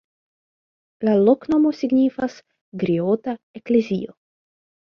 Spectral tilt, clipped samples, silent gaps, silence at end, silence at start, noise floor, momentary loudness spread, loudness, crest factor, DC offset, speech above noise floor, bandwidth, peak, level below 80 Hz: -8.5 dB/octave; under 0.1%; 2.61-2.72 s, 3.43-3.54 s; 0.8 s; 1 s; under -90 dBFS; 13 LU; -20 LUFS; 18 dB; under 0.1%; over 70 dB; 6.8 kHz; -4 dBFS; -62 dBFS